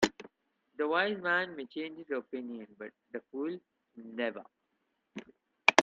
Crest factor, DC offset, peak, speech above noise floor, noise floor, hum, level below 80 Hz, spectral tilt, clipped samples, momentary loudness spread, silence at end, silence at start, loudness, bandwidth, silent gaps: 32 dB; under 0.1%; -2 dBFS; 44 dB; -80 dBFS; none; -74 dBFS; -3 dB/octave; under 0.1%; 20 LU; 0 s; 0 s; -34 LUFS; 9 kHz; none